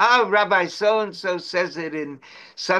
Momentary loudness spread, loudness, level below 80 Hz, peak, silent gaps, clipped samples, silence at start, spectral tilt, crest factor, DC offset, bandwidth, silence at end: 16 LU; -21 LUFS; -76 dBFS; -4 dBFS; none; under 0.1%; 0 s; -3.5 dB/octave; 16 dB; under 0.1%; 11.5 kHz; 0 s